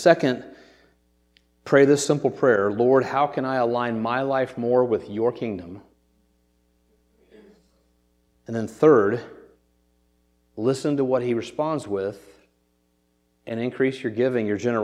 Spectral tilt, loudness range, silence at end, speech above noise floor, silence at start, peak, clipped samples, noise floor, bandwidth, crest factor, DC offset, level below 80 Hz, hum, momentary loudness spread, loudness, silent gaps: -6 dB/octave; 7 LU; 0 s; 46 dB; 0 s; -2 dBFS; under 0.1%; -68 dBFS; 13 kHz; 22 dB; under 0.1%; -66 dBFS; none; 13 LU; -22 LUFS; none